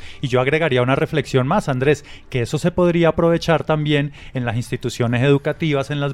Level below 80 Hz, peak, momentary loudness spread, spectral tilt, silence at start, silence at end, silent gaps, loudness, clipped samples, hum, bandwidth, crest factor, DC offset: -42 dBFS; -2 dBFS; 8 LU; -6.5 dB/octave; 0 s; 0 s; none; -19 LUFS; under 0.1%; none; 13 kHz; 16 dB; under 0.1%